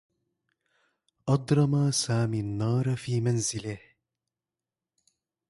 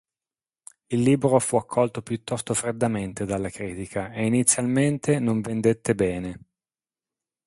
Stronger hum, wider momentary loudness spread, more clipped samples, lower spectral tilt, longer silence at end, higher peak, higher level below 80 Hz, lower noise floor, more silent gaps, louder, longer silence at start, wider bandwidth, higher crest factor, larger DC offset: neither; about the same, 12 LU vs 11 LU; neither; about the same, -5.5 dB/octave vs -5.5 dB/octave; first, 1.7 s vs 1.1 s; second, -12 dBFS vs -2 dBFS; second, -60 dBFS vs -54 dBFS; about the same, under -90 dBFS vs under -90 dBFS; neither; second, -27 LUFS vs -24 LUFS; first, 1.25 s vs 0.9 s; about the same, 11.5 kHz vs 12 kHz; about the same, 18 dB vs 22 dB; neither